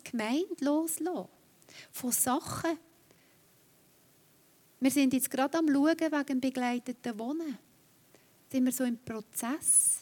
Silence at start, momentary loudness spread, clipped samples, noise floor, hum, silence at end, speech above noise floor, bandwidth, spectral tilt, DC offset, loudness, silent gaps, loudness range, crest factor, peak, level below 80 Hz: 0.05 s; 12 LU; under 0.1%; -64 dBFS; none; 0 s; 33 dB; 18 kHz; -2.5 dB/octave; under 0.1%; -30 LUFS; none; 5 LU; 18 dB; -14 dBFS; -76 dBFS